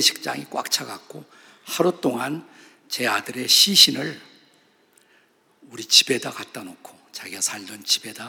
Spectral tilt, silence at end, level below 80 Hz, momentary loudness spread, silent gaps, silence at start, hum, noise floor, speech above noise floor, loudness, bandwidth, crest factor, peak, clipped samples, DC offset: -1 dB/octave; 0 s; -76 dBFS; 23 LU; none; 0 s; none; -60 dBFS; 37 dB; -19 LUFS; 19.5 kHz; 24 dB; 0 dBFS; under 0.1%; under 0.1%